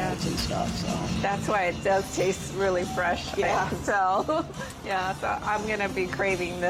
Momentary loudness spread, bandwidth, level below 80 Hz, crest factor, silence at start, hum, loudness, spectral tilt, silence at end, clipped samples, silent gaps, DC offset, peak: 4 LU; 16 kHz; -46 dBFS; 12 dB; 0 s; none; -27 LUFS; -4.5 dB/octave; 0 s; under 0.1%; none; under 0.1%; -14 dBFS